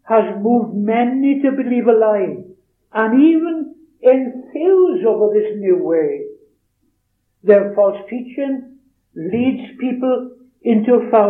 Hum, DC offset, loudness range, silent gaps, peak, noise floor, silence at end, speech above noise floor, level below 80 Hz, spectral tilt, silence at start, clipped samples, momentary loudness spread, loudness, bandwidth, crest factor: none; under 0.1%; 4 LU; none; 0 dBFS; -67 dBFS; 0 s; 52 dB; -68 dBFS; -10.5 dB/octave; 0.05 s; under 0.1%; 13 LU; -16 LUFS; 3.8 kHz; 16 dB